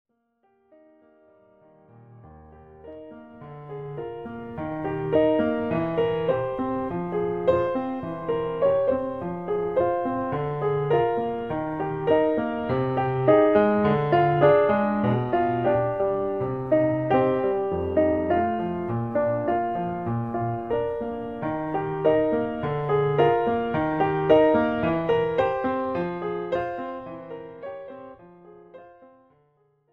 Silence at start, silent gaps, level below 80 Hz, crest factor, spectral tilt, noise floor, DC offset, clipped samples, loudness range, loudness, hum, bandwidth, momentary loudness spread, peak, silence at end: 2.1 s; none; -54 dBFS; 20 dB; -9.5 dB/octave; -68 dBFS; 0.2%; under 0.1%; 11 LU; -24 LUFS; none; 5.2 kHz; 15 LU; -6 dBFS; 0.85 s